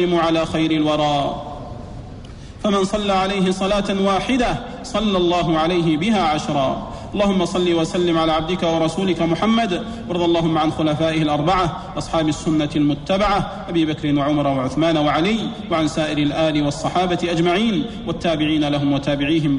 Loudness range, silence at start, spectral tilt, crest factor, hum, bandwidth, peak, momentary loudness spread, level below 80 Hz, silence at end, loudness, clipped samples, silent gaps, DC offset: 2 LU; 0 s; -6 dB/octave; 12 dB; none; 10.5 kHz; -6 dBFS; 7 LU; -38 dBFS; 0 s; -19 LUFS; under 0.1%; none; under 0.1%